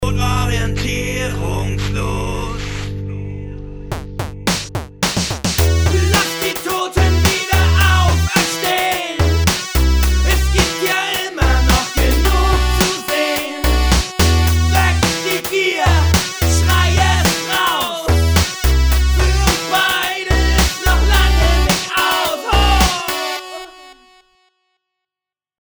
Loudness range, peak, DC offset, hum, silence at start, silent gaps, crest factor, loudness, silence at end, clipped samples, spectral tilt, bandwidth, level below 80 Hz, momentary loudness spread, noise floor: 6 LU; 0 dBFS; under 0.1%; none; 0 s; none; 16 dB; -15 LUFS; 1.65 s; under 0.1%; -4 dB/octave; over 20 kHz; -20 dBFS; 10 LU; -88 dBFS